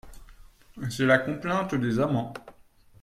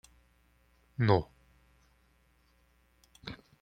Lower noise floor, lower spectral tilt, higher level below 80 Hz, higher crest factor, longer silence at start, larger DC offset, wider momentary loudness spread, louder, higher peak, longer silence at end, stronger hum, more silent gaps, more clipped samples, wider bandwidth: second, -56 dBFS vs -68 dBFS; second, -6.5 dB/octave vs -8 dB/octave; first, -54 dBFS vs -60 dBFS; about the same, 22 dB vs 26 dB; second, 0.05 s vs 1 s; neither; second, 15 LU vs 20 LU; first, -26 LUFS vs -32 LUFS; about the same, -8 dBFS vs -10 dBFS; first, 0.5 s vs 0.25 s; neither; neither; neither; first, 15 kHz vs 9.4 kHz